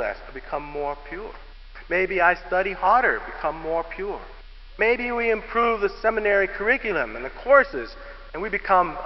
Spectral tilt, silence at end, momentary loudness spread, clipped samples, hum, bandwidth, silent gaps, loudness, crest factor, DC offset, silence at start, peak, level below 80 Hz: -7 dB/octave; 0 s; 16 LU; under 0.1%; none; 6 kHz; none; -23 LUFS; 20 dB; 0.1%; 0 s; -4 dBFS; -42 dBFS